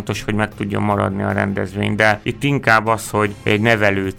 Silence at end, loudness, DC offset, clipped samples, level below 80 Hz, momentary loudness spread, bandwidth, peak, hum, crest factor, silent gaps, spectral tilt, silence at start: 0 s; -17 LUFS; under 0.1%; under 0.1%; -42 dBFS; 7 LU; 16.5 kHz; 0 dBFS; none; 16 dB; none; -5.5 dB/octave; 0 s